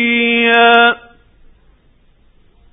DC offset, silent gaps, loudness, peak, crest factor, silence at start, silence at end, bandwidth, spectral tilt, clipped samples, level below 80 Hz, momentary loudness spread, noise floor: under 0.1%; none; -9 LUFS; 0 dBFS; 14 dB; 0 s; 1.75 s; 3.8 kHz; -5.5 dB/octave; under 0.1%; -52 dBFS; 7 LU; -51 dBFS